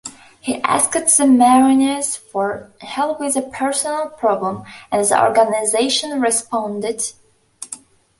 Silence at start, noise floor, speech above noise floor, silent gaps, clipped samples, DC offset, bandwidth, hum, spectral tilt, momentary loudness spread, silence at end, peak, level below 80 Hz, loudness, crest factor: 0.05 s; -40 dBFS; 23 dB; none; under 0.1%; under 0.1%; 12 kHz; none; -2.5 dB/octave; 18 LU; 0.45 s; 0 dBFS; -60 dBFS; -17 LUFS; 18 dB